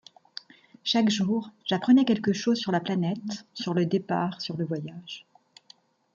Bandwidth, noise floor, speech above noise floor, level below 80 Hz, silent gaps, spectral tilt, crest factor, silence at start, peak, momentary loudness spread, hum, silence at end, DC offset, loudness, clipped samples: 7.6 kHz; -58 dBFS; 32 dB; -72 dBFS; none; -5.5 dB/octave; 16 dB; 0.85 s; -10 dBFS; 20 LU; none; 0.95 s; under 0.1%; -26 LUFS; under 0.1%